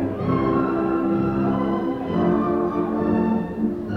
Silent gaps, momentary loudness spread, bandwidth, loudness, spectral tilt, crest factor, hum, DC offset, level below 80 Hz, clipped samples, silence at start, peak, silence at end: none; 3 LU; 5.8 kHz; -22 LUFS; -10 dB/octave; 12 dB; none; under 0.1%; -44 dBFS; under 0.1%; 0 s; -8 dBFS; 0 s